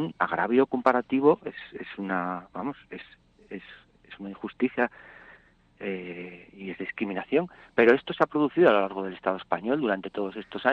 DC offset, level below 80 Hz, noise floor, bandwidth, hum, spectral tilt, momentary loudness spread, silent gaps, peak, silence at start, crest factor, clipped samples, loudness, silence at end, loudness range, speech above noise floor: under 0.1%; -66 dBFS; -56 dBFS; 6.4 kHz; none; -8 dB/octave; 20 LU; none; -6 dBFS; 0 s; 22 dB; under 0.1%; -26 LUFS; 0 s; 10 LU; 30 dB